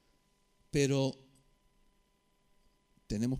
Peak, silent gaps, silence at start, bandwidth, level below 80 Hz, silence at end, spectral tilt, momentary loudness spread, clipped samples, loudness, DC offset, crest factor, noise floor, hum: -16 dBFS; none; 0.75 s; 15.5 kHz; -58 dBFS; 0 s; -5.5 dB/octave; 12 LU; under 0.1%; -33 LUFS; under 0.1%; 20 dB; -73 dBFS; none